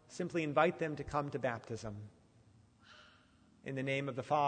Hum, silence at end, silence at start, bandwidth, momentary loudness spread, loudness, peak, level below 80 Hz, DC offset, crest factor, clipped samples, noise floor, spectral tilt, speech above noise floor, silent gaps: none; 0 s; 0.1 s; 9.4 kHz; 16 LU; -37 LUFS; -16 dBFS; -66 dBFS; under 0.1%; 22 dB; under 0.1%; -66 dBFS; -6 dB/octave; 30 dB; none